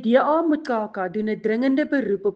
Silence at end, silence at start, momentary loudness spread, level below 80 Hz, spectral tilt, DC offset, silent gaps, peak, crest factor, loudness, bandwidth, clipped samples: 0 s; 0 s; 8 LU; -66 dBFS; -7.5 dB/octave; under 0.1%; none; -6 dBFS; 16 dB; -22 LUFS; 7.4 kHz; under 0.1%